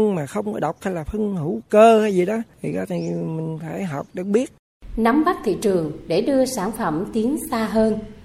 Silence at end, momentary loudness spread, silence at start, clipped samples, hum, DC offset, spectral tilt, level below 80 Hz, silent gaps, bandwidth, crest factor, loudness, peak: 0 s; 11 LU; 0 s; under 0.1%; none; under 0.1%; -6.5 dB/octave; -46 dBFS; 4.59-4.80 s; 16 kHz; 18 dB; -21 LUFS; -2 dBFS